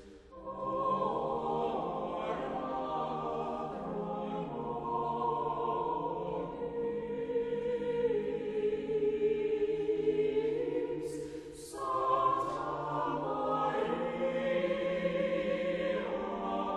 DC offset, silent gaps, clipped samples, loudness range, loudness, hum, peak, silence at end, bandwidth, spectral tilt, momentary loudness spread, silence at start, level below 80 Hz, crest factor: under 0.1%; none; under 0.1%; 3 LU; -34 LUFS; none; -16 dBFS; 0 s; 12 kHz; -6.5 dB/octave; 7 LU; 0 s; -60 dBFS; 18 dB